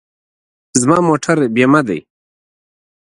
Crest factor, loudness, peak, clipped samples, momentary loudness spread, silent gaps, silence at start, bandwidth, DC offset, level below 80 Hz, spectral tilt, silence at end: 16 dB; -13 LUFS; 0 dBFS; under 0.1%; 8 LU; none; 0.75 s; 11.5 kHz; under 0.1%; -56 dBFS; -5 dB/octave; 1.1 s